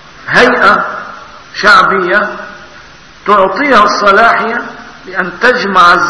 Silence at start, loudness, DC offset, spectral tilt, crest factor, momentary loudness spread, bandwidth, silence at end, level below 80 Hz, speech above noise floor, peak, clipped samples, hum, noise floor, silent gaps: 0.2 s; -8 LUFS; 0.6%; -4 dB/octave; 10 dB; 19 LU; 11 kHz; 0 s; -42 dBFS; 27 dB; 0 dBFS; 2%; none; -35 dBFS; none